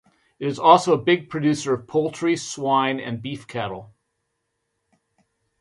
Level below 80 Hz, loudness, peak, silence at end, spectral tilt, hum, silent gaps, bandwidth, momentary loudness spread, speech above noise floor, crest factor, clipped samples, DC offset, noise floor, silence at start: -64 dBFS; -21 LUFS; 0 dBFS; 1.75 s; -5 dB/octave; none; none; 11.5 kHz; 15 LU; 55 dB; 22 dB; under 0.1%; under 0.1%; -76 dBFS; 0.4 s